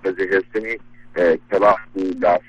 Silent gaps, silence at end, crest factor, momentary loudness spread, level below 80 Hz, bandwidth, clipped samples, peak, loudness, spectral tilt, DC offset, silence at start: none; 0.1 s; 18 dB; 12 LU; -52 dBFS; 8.2 kHz; under 0.1%; -2 dBFS; -19 LUFS; -6.5 dB/octave; under 0.1%; 0.05 s